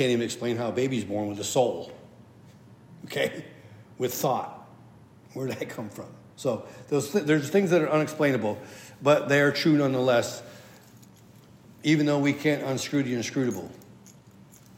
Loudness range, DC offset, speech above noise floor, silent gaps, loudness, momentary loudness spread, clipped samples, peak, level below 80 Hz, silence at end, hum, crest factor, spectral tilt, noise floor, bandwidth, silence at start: 9 LU; under 0.1%; 27 dB; none; -26 LUFS; 18 LU; under 0.1%; -8 dBFS; -72 dBFS; 0.65 s; none; 20 dB; -5 dB/octave; -52 dBFS; 16 kHz; 0 s